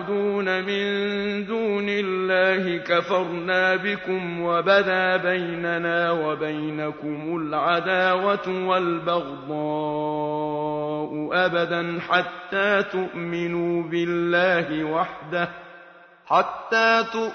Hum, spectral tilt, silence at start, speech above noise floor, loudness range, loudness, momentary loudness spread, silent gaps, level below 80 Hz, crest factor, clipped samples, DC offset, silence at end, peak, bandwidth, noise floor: none; -6 dB/octave; 0 s; 25 dB; 3 LU; -23 LUFS; 8 LU; none; -64 dBFS; 18 dB; under 0.1%; under 0.1%; 0 s; -4 dBFS; 6.6 kHz; -48 dBFS